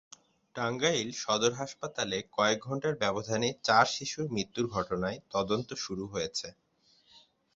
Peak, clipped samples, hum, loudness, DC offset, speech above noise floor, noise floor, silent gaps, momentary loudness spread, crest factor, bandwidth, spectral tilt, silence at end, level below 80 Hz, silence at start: -8 dBFS; under 0.1%; none; -31 LUFS; under 0.1%; 35 dB; -66 dBFS; none; 10 LU; 24 dB; 8 kHz; -3.5 dB/octave; 0.35 s; -62 dBFS; 0.55 s